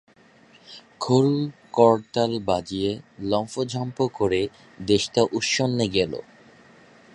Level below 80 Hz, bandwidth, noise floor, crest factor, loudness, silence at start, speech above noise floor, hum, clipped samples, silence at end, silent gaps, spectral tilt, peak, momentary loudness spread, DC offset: -54 dBFS; 11 kHz; -54 dBFS; 22 dB; -23 LUFS; 0.7 s; 31 dB; none; under 0.1%; 0.95 s; none; -5 dB/octave; -2 dBFS; 13 LU; under 0.1%